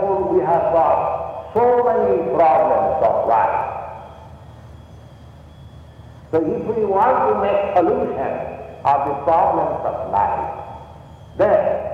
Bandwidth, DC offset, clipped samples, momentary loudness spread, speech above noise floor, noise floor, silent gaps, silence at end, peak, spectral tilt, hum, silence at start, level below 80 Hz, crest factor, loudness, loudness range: 7 kHz; under 0.1%; under 0.1%; 13 LU; 24 dB; -41 dBFS; none; 0 s; -4 dBFS; -8.5 dB/octave; none; 0 s; -46 dBFS; 14 dB; -18 LUFS; 8 LU